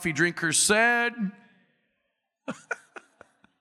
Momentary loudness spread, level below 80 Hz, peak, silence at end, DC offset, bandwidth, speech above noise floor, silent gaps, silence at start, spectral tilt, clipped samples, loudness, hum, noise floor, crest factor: 20 LU; -66 dBFS; -10 dBFS; 0.85 s; under 0.1%; 16 kHz; 54 dB; none; 0 s; -2.5 dB/octave; under 0.1%; -23 LUFS; none; -79 dBFS; 20 dB